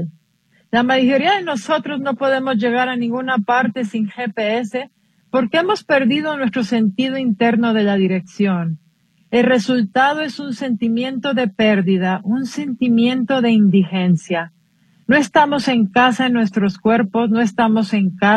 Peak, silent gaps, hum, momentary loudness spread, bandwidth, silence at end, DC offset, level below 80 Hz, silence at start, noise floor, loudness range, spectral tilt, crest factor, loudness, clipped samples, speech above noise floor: 0 dBFS; none; none; 8 LU; 10 kHz; 0 s; under 0.1%; -60 dBFS; 0 s; -59 dBFS; 3 LU; -6 dB/octave; 16 dB; -17 LUFS; under 0.1%; 43 dB